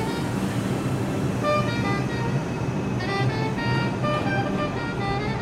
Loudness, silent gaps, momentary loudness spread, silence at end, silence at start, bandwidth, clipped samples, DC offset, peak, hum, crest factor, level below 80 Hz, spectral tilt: -25 LUFS; none; 3 LU; 0 s; 0 s; 15 kHz; under 0.1%; under 0.1%; -10 dBFS; none; 14 dB; -44 dBFS; -6.5 dB/octave